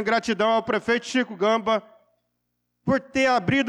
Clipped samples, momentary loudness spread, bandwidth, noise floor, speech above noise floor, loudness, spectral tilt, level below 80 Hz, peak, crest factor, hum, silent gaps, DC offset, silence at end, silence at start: under 0.1%; 5 LU; 11 kHz; -77 dBFS; 54 dB; -23 LUFS; -5 dB/octave; -58 dBFS; -12 dBFS; 12 dB; 60 Hz at -55 dBFS; none; under 0.1%; 0 s; 0 s